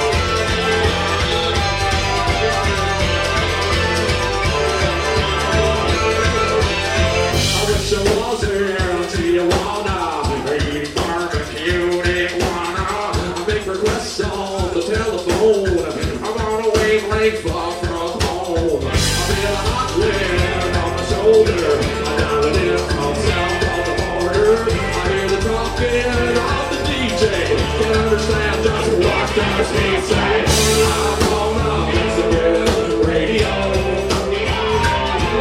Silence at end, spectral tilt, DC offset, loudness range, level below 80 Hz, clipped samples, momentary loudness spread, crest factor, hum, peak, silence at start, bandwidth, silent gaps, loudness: 0 s; -4.5 dB/octave; under 0.1%; 3 LU; -28 dBFS; under 0.1%; 5 LU; 16 dB; none; -2 dBFS; 0 s; 16 kHz; none; -17 LUFS